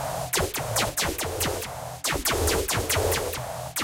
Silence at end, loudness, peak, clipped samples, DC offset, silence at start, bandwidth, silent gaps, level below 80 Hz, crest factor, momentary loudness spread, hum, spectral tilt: 0 s; -26 LUFS; -10 dBFS; under 0.1%; under 0.1%; 0 s; 17 kHz; none; -40 dBFS; 18 dB; 7 LU; none; -2.5 dB/octave